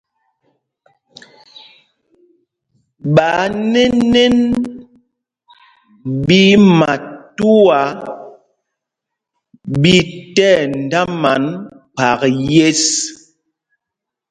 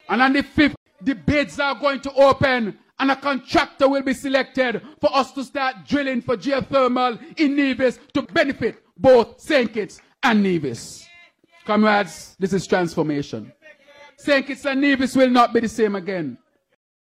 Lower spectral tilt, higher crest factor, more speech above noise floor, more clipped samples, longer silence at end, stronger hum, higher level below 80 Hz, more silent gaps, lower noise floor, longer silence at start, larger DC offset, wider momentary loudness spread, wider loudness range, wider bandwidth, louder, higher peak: about the same, -4.5 dB/octave vs -5.5 dB/octave; about the same, 16 dB vs 16 dB; first, 69 dB vs 32 dB; neither; first, 1.15 s vs 0.65 s; neither; about the same, -46 dBFS vs -50 dBFS; second, none vs 0.77-0.86 s; first, -82 dBFS vs -52 dBFS; first, 3.05 s vs 0.1 s; neither; first, 16 LU vs 11 LU; about the same, 4 LU vs 3 LU; second, 11 kHz vs 14.5 kHz; first, -13 LUFS vs -20 LUFS; first, 0 dBFS vs -4 dBFS